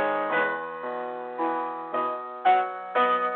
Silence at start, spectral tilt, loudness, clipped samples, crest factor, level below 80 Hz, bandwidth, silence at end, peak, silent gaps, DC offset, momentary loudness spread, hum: 0 s; -7.5 dB/octave; -27 LUFS; under 0.1%; 16 dB; -78 dBFS; 4.3 kHz; 0 s; -10 dBFS; none; under 0.1%; 10 LU; none